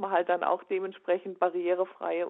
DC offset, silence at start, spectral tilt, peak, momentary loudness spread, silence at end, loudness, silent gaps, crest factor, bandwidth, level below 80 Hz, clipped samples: under 0.1%; 0 s; -8.5 dB/octave; -12 dBFS; 4 LU; 0 s; -30 LUFS; none; 18 dB; 4 kHz; -86 dBFS; under 0.1%